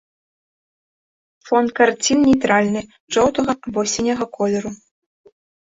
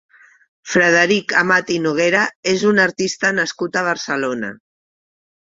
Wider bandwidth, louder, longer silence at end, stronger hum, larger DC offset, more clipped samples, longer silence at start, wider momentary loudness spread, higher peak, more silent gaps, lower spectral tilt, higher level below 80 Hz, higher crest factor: about the same, 8 kHz vs 7.8 kHz; about the same, -18 LUFS vs -16 LUFS; about the same, 1.05 s vs 1 s; neither; neither; neither; first, 1.45 s vs 0.65 s; about the same, 8 LU vs 7 LU; about the same, -2 dBFS vs -2 dBFS; about the same, 3.00-3.08 s vs 2.35-2.43 s; about the same, -4 dB/octave vs -4 dB/octave; first, -50 dBFS vs -60 dBFS; about the same, 18 dB vs 18 dB